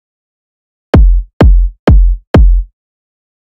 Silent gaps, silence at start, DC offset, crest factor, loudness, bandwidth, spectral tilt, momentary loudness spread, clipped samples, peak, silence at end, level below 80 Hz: 1.33-1.40 s, 1.79-1.87 s, 2.27-2.34 s; 0.95 s; under 0.1%; 8 dB; -10 LUFS; 5.6 kHz; -9 dB/octave; 3 LU; 2%; 0 dBFS; 0.85 s; -10 dBFS